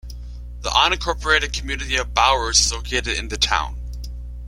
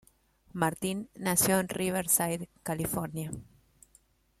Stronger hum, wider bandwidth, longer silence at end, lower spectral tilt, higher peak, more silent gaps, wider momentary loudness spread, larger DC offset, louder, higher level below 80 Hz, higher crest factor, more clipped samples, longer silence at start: first, 60 Hz at -30 dBFS vs none; about the same, 15.5 kHz vs 16 kHz; second, 0 s vs 0.95 s; second, -1.5 dB/octave vs -4 dB/octave; first, -2 dBFS vs -10 dBFS; neither; first, 17 LU vs 13 LU; neither; first, -19 LUFS vs -30 LUFS; first, -30 dBFS vs -60 dBFS; about the same, 20 dB vs 24 dB; neither; second, 0.05 s vs 0.55 s